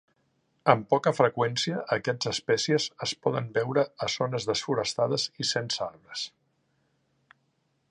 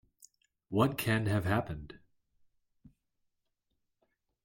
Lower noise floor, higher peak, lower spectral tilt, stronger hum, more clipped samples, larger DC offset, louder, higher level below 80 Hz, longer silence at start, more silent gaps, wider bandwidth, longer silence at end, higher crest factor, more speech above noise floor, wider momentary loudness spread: second, -73 dBFS vs -82 dBFS; first, -4 dBFS vs -14 dBFS; second, -4 dB/octave vs -6.5 dB/octave; neither; neither; neither; first, -27 LUFS vs -32 LUFS; second, -68 dBFS vs -60 dBFS; about the same, 0.65 s vs 0.7 s; neither; second, 11 kHz vs 16.5 kHz; second, 1.6 s vs 2.5 s; about the same, 26 dB vs 22 dB; second, 46 dB vs 51 dB; second, 7 LU vs 15 LU